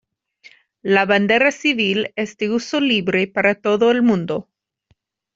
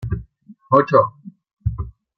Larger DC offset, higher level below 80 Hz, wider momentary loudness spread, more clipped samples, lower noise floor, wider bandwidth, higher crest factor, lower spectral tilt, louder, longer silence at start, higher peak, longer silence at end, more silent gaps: neither; second, -62 dBFS vs -38 dBFS; second, 9 LU vs 15 LU; neither; first, -64 dBFS vs -46 dBFS; first, 7.6 kHz vs 6.2 kHz; about the same, 16 dB vs 18 dB; second, -5 dB/octave vs -9.5 dB/octave; about the same, -18 LUFS vs -19 LUFS; first, 0.85 s vs 0 s; about the same, -2 dBFS vs -2 dBFS; first, 0.95 s vs 0.25 s; second, none vs 1.53-1.57 s